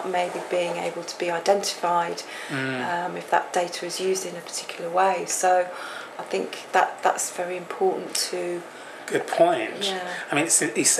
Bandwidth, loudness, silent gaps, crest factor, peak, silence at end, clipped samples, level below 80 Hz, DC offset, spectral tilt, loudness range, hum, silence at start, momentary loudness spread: 14.5 kHz; -25 LUFS; none; 20 dB; -6 dBFS; 0 s; under 0.1%; -84 dBFS; under 0.1%; -2 dB/octave; 2 LU; none; 0 s; 10 LU